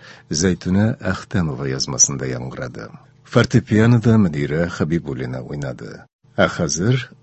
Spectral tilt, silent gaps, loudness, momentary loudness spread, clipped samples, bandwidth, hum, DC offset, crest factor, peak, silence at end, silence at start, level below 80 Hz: -5 dB/octave; 6.13-6.19 s; -19 LUFS; 15 LU; under 0.1%; 8.4 kHz; none; under 0.1%; 20 dB; 0 dBFS; 0.15 s; 0 s; -40 dBFS